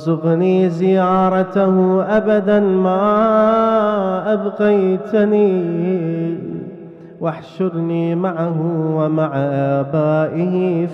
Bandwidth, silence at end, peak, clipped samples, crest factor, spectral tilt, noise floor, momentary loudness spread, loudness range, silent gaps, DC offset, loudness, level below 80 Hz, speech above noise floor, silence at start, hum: 6.2 kHz; 0 s; -4 dBFS; under 0.1%; 12 dB; -9.5 dB/octave; -36 dBFS; 9 LU; 6 LU; none; under 0.1%; -16 LUFS; -56 dBFS; 20 dB; 0 s; none